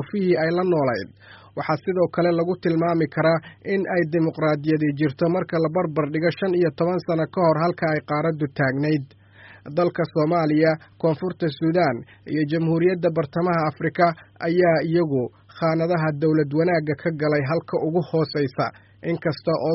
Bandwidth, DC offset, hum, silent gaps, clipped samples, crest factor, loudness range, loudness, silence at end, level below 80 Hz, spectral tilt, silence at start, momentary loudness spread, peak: 5.8 kHz; under 0.1%; none; none; under 0.1%; 16 dB; 1 LU; -22 LUFS; 0 s; -60 dBFS; -6.5 dB/octave; 0 s; 6 LU; -6 dBFS